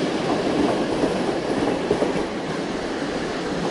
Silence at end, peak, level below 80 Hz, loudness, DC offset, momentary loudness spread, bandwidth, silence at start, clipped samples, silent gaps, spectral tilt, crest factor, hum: 0 s; -6 dBFS; -48 dBFS; -23 LUFS; under 0.1%; 5 LU; 11.5 kHz; 0 s; under 0.1%; none; -5.5 dB/octave; 16 dB; none